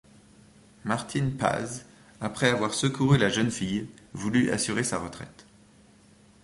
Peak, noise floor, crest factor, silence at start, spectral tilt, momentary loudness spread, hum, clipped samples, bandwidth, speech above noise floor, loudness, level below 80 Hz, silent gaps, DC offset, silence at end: -6 dBFS; -57 dBFS; 22 dB; 0.85 s; -5 dB/octave; 17 LU; none; under 0.1%; 11.5 kHz; 30 dB; -27 LUFS; -56 dBFS; none; under 0.1%; 1.15 s